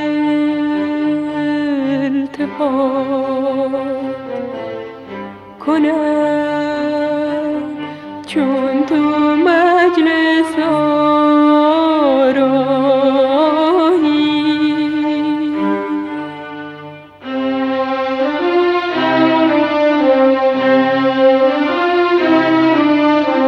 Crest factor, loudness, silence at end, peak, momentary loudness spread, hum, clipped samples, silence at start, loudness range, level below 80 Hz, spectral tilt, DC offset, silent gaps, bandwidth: 12 dB; -14 LUFS; 0 s; -2 dBFS; 13 LU; none; under 0.1%; 0 s; 7 LU; -56 dBFS; -6 dB/octave; under 0.1%; none; 10 kHz